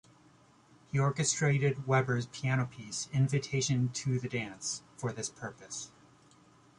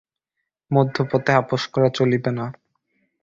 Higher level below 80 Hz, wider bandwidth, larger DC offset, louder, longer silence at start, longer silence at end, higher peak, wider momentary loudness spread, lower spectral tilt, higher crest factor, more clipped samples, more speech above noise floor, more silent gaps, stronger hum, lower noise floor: second, -66 dBFS vs -58 dBFS; first, 11 kHz vs 7.6 kHz; neither; second, -32 LUFS vs -21 LUFS; first, 0.95 s vs 0.7 s; first, 0.9 s vs 0.7 s; second, -14 dBFS vs -2 dBFS; first, 12 LU vs 8 LU; second, -4.5 dB/octave vs -7 dB/octave; about the same, 20 dB vs 20 dB; neither; second, 30 dB vs 61 dB; neither; neither; second, -62 dBFS vs -80 dBFS